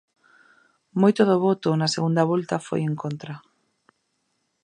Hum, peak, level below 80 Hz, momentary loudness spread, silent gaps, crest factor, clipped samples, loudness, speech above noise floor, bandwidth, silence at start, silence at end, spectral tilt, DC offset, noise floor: none; -4 dBFS; -72 dBFS; 14 LU; none; 20 dB; under 0.1%; -22 LUFS; 52 dB; 10.5 kHz; 0.95 s; 1.25 s; -6.5 dB/octave; under 0.1%; -73 dBFS